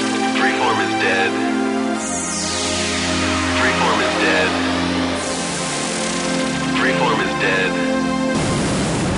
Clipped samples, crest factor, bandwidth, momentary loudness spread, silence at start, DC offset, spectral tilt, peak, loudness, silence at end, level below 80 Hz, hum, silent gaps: under 0.1%; 14 dB; 11 kHz; 5 LU; 0 s; under 0.1%; -3.5 dB/octave; -4 dBFS; -18 LUFS; 0 s; -42 dBFS; none; none